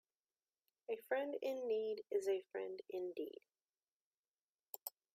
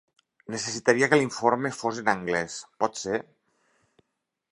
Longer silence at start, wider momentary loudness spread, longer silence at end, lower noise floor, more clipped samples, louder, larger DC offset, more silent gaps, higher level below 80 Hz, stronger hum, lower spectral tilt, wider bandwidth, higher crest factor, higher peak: first, 0.9 s vs 0.5 s; about the same, 11 LU vs 11 LU; second, 0.25 s vs 1.3 s; first, under -90 dBFS vs -81 dBFS; neither; second, -44 LUFS vs -26 LUFS; neither; first, 3.83-4.11 s, 4.17-4.32 s, 4.41-4.63 s, 4.69-4.73 s vs none; second, under -90 dBFS vs -68 dBFS; neither; about the same, -3.5 dB/octave vs -4 dB/octave; first, 15.5 kHz vs 11.5 kHz; about the same, 20 dB vs 24 dB; second, -26 dBFS vs -4 dBFS